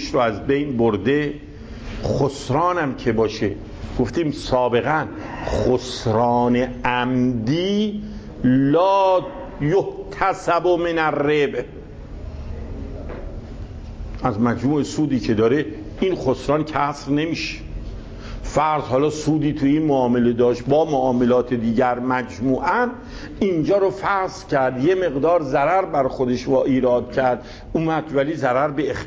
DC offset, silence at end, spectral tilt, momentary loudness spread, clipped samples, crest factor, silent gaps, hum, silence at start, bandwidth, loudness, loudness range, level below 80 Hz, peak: under 0.1%; 0 s; -6.5 dB/octave; 16 LU; under 0.1%; 16 dB; none; none; 0 s; 8 kHz; -20 LUFS; 4 LU; -38 dBFS; -4 dBFS